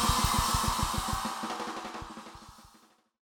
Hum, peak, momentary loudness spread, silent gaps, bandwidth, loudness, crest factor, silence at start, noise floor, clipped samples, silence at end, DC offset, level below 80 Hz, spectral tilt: none; -14 dBFS; 19 LU; none; over 20 kHz; -30 LUFS; 18 dB; 0 s; -63 dBFS; under 0.1%; 0.65 s; under 0.1%; -40 dBFS; -3 dB/octave